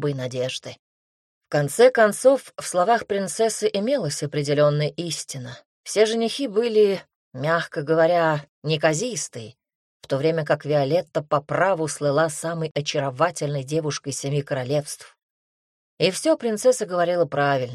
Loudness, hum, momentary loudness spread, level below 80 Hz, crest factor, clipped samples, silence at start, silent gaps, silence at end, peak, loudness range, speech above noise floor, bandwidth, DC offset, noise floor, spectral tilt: -22 LUFS; none; 10 LU; -66 dBFS; 18 dB; under 0.1%; 0 s; 0.79-1.41 s, 5.66-5.84 s, 7.15-7.31 s, 8.49-8.62 s, 9.75-10.00 s, 12.71-12.75 s, 15.23-15.97 s; 0 s; -4 dBFS; 4 LU; over 68 dB; 14 kHz; under 0.1%; under -90 dBFS; -4.5 dB/octave